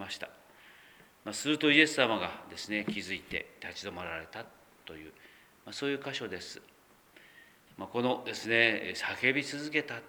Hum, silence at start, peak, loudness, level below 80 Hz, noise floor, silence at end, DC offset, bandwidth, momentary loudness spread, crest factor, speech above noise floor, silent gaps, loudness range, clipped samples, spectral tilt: none; 0 s; -8 dBFS; -31 LUFS; -70 dBFS; -60 dBFS; 0 s; under 0.1%; over 20 kHz; 21 LU; 26 dB; 28 dB; none; 11 LU; under 0.1%; -3.5 dB/octave